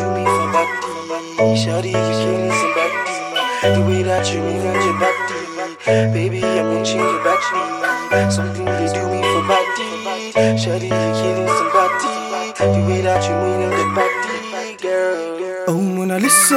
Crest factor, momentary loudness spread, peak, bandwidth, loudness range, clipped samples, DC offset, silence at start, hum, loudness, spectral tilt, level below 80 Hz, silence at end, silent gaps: 18 dB; 7 LU; 0 dBFS; 16 kHz; 1 LU; under 0.1%; under 0.1%; 0 s; none; -18 LUFS; -4.5 dB/octave; -56 dBFS; 0 s; none